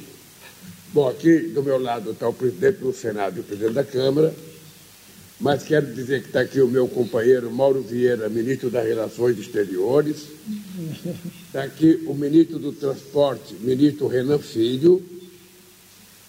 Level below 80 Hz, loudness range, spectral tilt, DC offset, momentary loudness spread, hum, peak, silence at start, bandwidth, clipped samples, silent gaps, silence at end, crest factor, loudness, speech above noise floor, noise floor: -64 dBFS; 3 LU; -6.5 dB/octave; under 0.1%; 13 LU; none; -6 dBFS; 0 s; 16 kHz; under 0.1%; none; 1 s; 16 dB; -21 LUFS; 28 dB; -49 dBFS